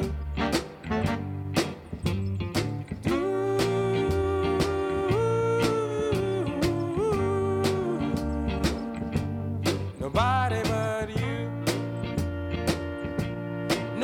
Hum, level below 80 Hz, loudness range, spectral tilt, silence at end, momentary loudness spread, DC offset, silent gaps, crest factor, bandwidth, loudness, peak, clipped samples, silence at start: none; -42 dBFS; 3 LU; -6 dB/octave; 0 s; 7 LU; under 0.1%; none; 16 dB; 17.5 kHz; -28 LUFS; -10 dBFS; under 0.1%; 0 s